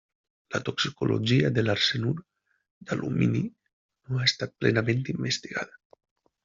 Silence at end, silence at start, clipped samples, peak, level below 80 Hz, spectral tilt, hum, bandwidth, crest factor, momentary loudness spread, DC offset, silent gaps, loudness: 0.8 s; 0.5 s; under 0.1%; -8 dBFS; -60 dBFS; -4.5 dB/octave; none; 7.6 kHz; 20 dB; 11 LU; under 0.1%; 2.71-2.81 s, 3.73-3.89 s; -27 LUFS